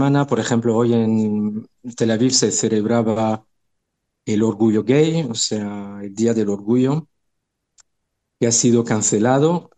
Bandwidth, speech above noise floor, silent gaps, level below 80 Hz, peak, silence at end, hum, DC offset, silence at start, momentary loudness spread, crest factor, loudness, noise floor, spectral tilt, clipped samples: 9.4 kHz; 57 dB; none; -62 dBFS; -4 dBFS; 0.15 s; none; under 0.1%; 0 s; 10 LU; 16 dB; -18 LUFS; -75 dBFS; -5 dB/octave; under 0.1%